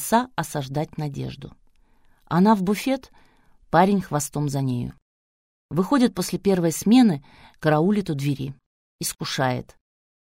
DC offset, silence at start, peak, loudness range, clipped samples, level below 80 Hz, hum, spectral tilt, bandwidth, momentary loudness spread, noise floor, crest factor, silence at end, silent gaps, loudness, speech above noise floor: under 0.1%; 0 s; -4 dBFS; 4 LU; under 0.1%; -54 dBFS; none; -5.5 dB/octave; 16 kHz; 12 LU; -57 dBFS; 20 dB; 0.6 s; 5.02-5.69 s, 8.66-8.99 s; -23 LUFS; 35 dB